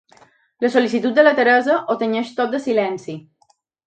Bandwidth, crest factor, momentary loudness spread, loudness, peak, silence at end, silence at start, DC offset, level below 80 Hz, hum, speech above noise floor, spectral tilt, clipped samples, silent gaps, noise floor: 9 kHz; 18 dB; 12 LU; -18 LUFS; 0 dBFS; 0.65 s; 0.6 s; under 0.1%; -70 dBFS; none; 44 dB; -5 dB/octave; under 0.1%; none; -61 dBFS